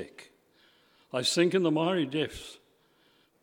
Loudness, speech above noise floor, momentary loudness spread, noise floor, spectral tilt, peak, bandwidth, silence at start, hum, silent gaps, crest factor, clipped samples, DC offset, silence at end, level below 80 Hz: -28 LUFS; 39 dB; 20 LU; -66 dBFS; -4.5 dB/octave; -12 dBFS; 16.5 kHz; 0 s; none; none; 20 dB; under 0.1%; under 0.1%; 0.85 s; -62 dBFS